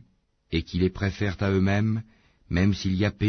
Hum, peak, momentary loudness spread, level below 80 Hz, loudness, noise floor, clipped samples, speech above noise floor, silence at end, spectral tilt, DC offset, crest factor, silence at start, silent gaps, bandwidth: none; -10 dBFS; 7 LU; -44 dBFS; -26 LUFS; -63 dBFS; under 0.1%; 39 dB; 0 s; -7 dB/octave; under 0.1%; 16 dB; 0.5 s; none; 6.6 kHz